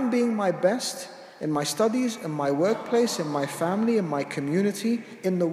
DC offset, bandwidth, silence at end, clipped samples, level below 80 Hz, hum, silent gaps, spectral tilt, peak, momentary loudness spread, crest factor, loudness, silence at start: under 0.1%; 15.5 kHz; 0 s; under 0.1%; -78 dBFS; none; none; -5 dB/octave; -10 dBFS; 5 LU; 16 dB; -26 LUFS; 0 s